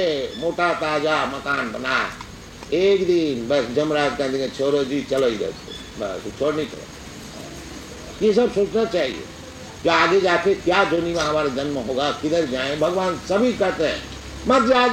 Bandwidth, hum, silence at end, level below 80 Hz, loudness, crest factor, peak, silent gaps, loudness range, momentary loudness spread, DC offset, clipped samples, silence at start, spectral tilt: 16 kHz; none; 0 s; -46 dBFS; -21 LUFS; 18 dB; -2 dBFS; none; 5 LU; 18 LU; under 0.1%; under 0.1%; 0 s; -4.5 dB/octave